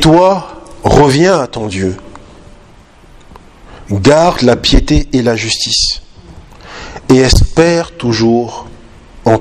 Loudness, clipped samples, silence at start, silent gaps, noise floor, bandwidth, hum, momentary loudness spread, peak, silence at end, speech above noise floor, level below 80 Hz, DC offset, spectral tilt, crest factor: -11 LUFS; 0.8%; 0 s; none; -40 dBFS; 14.5 kHz; none; 16 LU; 0 dBFS; 0 s; 30 dB; -22 dBFS; under 0.1%; -5 dB/octave; 12 dB